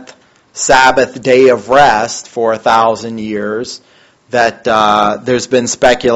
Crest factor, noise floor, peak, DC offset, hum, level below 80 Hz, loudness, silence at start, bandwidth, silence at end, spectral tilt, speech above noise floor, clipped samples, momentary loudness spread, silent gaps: 12 dB; -41 dBFS; 0 dBFS; under 0.1%; none; -42 dBFS; -11 LUFS; 0 s; 10.5 kHz; 0 s; -3 dB/octave; 30 dB; 0.4%; 11 LU; none